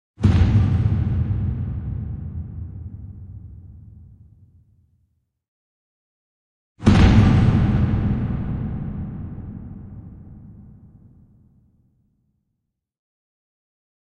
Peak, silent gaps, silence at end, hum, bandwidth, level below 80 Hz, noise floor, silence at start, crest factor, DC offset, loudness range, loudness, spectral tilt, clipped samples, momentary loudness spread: -2 dBFS; 5.48-6.75 s; 3.45 s; none; 9.2 kHz; -30 dBFS; -78 dBFS; 0.2 s; 22 dB; under 0.1%; 21 LU; -20 LUFS; -8 dB/octave; under 0.1%; 25 LU